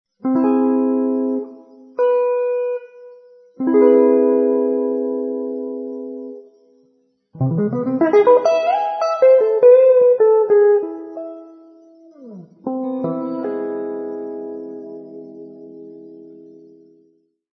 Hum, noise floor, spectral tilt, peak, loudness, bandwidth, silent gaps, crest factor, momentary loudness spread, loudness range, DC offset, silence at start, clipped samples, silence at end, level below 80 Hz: none; -61 dBFS; -8.5 dB/octave; -2 dBFS; -16 LUFS; 6.2 kHz; none; 16 dB; 22 LU; 14 LU; under 0.1%; 0.25 s; under 0.1%; 1.2 s; -70 dBFS